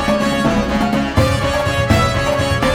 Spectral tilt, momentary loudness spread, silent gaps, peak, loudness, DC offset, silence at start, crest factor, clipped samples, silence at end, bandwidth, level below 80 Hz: -5.5 dB/octave; 2 LU; none; -2 dBFS; -16 LUFS; under 0.1%; 0 s; 14 dB; under 0.1%; 0 s; 18 kHz; -28 dBFS